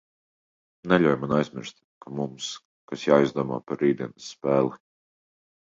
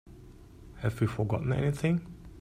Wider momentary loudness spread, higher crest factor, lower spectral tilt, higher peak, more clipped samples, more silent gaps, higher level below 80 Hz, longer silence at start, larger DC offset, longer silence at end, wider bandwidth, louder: first, 18 LU vs 7 LU; about the same, 22 dB vs 18 dB; second, -6 dB/octave vs -8 dB/octave; first, -4 dBFS vs -14 dBFS; neither; first, 1.84-2.01 s, 2.65-2.88 s vs none; second, -62 dBFS vs -50 dBFS; first, 0.85 s vs 0.05 s; neither; first, 1 s vs 0 s; second, 7.8 kHz vs 15 kHz; first, -25 LUFS vs -31 LUFS